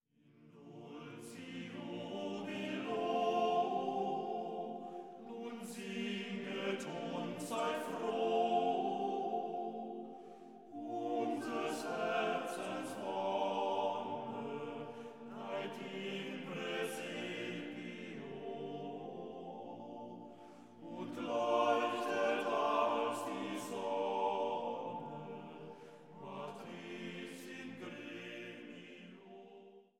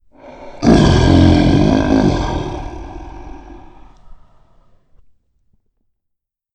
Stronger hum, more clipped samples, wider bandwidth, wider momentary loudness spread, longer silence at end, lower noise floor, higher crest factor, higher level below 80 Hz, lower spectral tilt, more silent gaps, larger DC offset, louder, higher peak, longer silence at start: neither; neither; first, 16.5 kHz vs 9.2 kHz; second, 17 LU vs 24 LU; second, 0.15 s vs 2.4 s; second, -65 dBFS vs -75 dBFS; about the same, 20 dB vs 16 dB; second, under -90 dBFS vs -26 dBFS; second, -5 dB/octave vs -7 dB/octave; neither; neither; second, -40 LUFS vs -13 LUFS; second, -20 dBFS vs 0 dBFS; about the same, 0.25 s vs 0.25 s